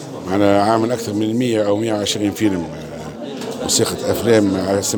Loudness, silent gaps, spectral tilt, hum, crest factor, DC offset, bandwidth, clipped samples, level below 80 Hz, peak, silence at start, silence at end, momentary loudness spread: -17 LUFS; none; -4.5 dB/octave; none; 16 dB; under 0.1%; over 20 kHz; under 0.1%; -50 dBFS; -2 dBFS; 0 s; 0 s; 14 LU